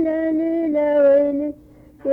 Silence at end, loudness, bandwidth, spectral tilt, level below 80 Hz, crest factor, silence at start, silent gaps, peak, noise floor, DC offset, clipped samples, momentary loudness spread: 0 s; -18 LUFS; 3.6 kHz; -8.5 dB/octave; -54 dBFS; 12 dB; 0 s; none; -8 dBFS; -46 dBFS; under 0.1%; under 0.1%; 13 LU